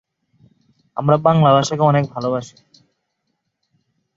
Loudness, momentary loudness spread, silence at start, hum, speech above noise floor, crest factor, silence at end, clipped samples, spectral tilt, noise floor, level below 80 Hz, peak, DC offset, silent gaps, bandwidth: -16 LUFS; 11 LU; 0.95 s; none; 58 dB; 18 dB; 1.7 s; under 0.1%; -6.5 dB/octave; -73 dBFS; -60 dBFS; -2 dBFS; under 0.1%; none; 7.8 kHz